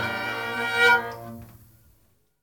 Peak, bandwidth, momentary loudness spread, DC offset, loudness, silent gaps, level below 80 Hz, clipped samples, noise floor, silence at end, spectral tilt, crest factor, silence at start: -6 dBFS; 18 kHz; 22 LU; under 0.1%; -22 LUFS; none; -60 dBFS; under 0.1%; -65 dBFS; 0.85 s; -3 dB/octave; 20 dB; 0 s